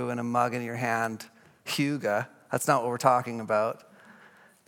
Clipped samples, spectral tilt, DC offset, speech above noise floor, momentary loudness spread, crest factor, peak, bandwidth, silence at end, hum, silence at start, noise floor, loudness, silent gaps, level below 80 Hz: under 0.1%; -5 dB/octave; under 0.1%; 29 dB; 12 LU; 22 dB; -6 dBFS; 17.5 kHz; 0.55 s; none; 0 s; -56 dBFS; -28 LUFS; none; -82 dBFS